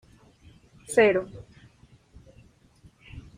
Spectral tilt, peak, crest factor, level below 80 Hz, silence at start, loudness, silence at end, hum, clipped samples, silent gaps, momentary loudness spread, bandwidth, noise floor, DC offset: -4.5 dB/octave; -8 dBFS; 22 dB; -56 dBFS; 0.9 s; -23 LUFS; 0.15 s; none; under 0.1%; none; 27 LU; 15.5 kHz; -57 dBFS; under 0.1%